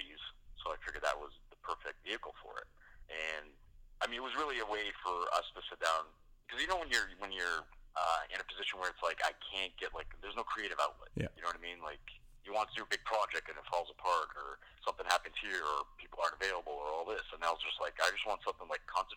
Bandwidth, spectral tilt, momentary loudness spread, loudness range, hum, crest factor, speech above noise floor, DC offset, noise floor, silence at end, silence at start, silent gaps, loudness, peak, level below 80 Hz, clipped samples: 18 kHz; -2 dB/octave; 12 LU; 5 LU; none; 28 dB; 20 dB; under 0.1%; -59 dBFS; 0 s; 0 s; none; -38 LUFS; -12 dBFS; -60 dBFS; under 0.1%